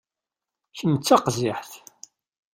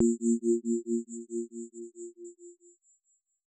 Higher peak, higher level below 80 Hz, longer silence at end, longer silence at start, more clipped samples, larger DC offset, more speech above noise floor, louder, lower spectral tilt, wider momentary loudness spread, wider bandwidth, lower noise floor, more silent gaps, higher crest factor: first, -4 dBFS vs -14 dBFS; first, -62 dBFS vs under -90 dBFS; second, 0.75 s vs 0.95 s; first, 0.75 s vs 0 s; neither; neither; first, 66 dB vs 46 dB; first, -22 LUFS vs -31 LUFS; second, -5 dB/octave vs -9 dB/octave; about the same, 23 LU vs 21 LU; first, 16 kHz vs 9.2 kHz; first, -88 dBFS vs -75 dBFS; neither; about the same, 22 dB vs 18 dB